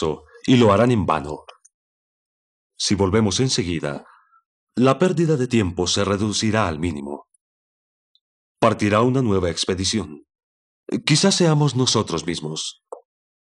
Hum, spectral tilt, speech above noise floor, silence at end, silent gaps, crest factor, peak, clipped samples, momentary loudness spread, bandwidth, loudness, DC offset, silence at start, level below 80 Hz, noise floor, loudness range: none; -5 dB/octave; over 71 dB; 0.45 s; 1.74-2.70 s, 4.45-4.67 s, 7.41-8.15 s, 8.21-8.55 s, 10.43-10.84 s; 20 dB; -2 dBFS; under 0.1%; 14 LU; 11.5 kHz; -20 LUFS; under 0.1%; 0 s; -50 dBFS; under -90 dBFS; 3 LU